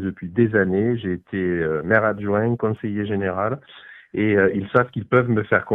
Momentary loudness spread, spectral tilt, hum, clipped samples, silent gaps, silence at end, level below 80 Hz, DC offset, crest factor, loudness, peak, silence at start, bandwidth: 7 LU; -10.5 dB/octave; none; under 0.1%; none; 0 s; -54 dBFS; under 0.1%; 20 dB; -21 LUFS; -2 dBFS; 0 s; 4 kHz